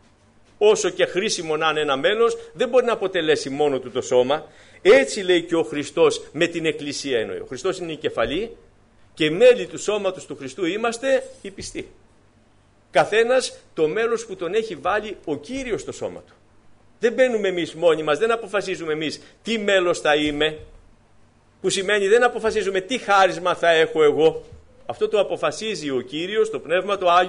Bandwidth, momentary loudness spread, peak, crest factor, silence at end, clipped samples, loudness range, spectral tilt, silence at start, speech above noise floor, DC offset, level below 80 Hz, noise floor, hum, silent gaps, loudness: 10.5 kHz; 11 LU; -6 dBFS; 16 dB; 0 s; under 0.1%; 5 LU; -3.5 dB/octave; 0.6 s; 35 dB; under 0.1%; -54 dBFS; -56 dBFS; none; none; -21 LUFS